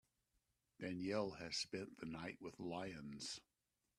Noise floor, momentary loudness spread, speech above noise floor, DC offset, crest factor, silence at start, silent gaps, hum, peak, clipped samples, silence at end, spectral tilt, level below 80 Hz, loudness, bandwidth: -86 dBFS; 8 LU; 39 dB; under 0.1%; 22 dB; 0.8 s; none; none; -28 dBFS; under 0.1%; 0.6 s; -4 dB/octave; -78 dBFS; -48 LUFS; 13 kHz